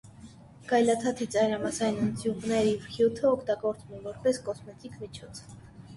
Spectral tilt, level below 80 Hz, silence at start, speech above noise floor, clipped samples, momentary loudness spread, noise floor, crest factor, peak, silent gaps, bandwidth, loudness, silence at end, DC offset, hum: -5 dB/octave; -58 dBFS; 0.05 s; 21 dB; under 0.1%; 19 LU; -50 dBFS; 18 dB; -12 dBFS; none; 11.5 kHz; -28 LUFS; 0 s; under 0.1%; none